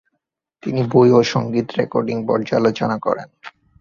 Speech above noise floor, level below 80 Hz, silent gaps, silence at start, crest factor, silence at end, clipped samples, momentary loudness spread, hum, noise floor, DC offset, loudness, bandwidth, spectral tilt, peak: 58 dB; -56 dBFS; none; 0.65 s; 18 dB; 0.3 s; under 0.1%; 12 LU; none; -75 dBFS; under 0.1%; -18 LUFS; 7.2 kHz; -7 dB/octave; -2 dBFS